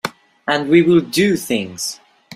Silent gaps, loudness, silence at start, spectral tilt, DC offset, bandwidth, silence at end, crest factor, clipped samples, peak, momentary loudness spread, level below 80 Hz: none; -16 LUFS; 0.05 s; -4.5 dB/octave; under 0.1%; 16 kHz; 0 s; 16 dB; under 0.1%; -2 dBFS; 16 LU; -58 dBFS